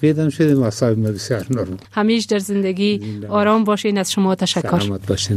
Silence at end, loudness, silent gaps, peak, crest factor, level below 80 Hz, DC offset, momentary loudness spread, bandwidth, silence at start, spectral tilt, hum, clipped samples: 0 s; -18 LUFS; none; -2 dBFS; 14 dB; -50 dBFS; under 0.1%; 6 LU; 15 kHz; 0 s; -5.5 dB/octave; none; under 0.1%